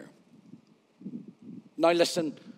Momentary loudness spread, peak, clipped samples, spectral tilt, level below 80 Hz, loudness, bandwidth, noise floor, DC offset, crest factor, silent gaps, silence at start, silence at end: 23 LU; -10 dBFS; under 0.1%; -4 dB/octave; under -90 dBFS; -26 LUFS; 16 kHz; -57 dBFS; under 0.1%; 22 dB; none; 0 s; 0.05 s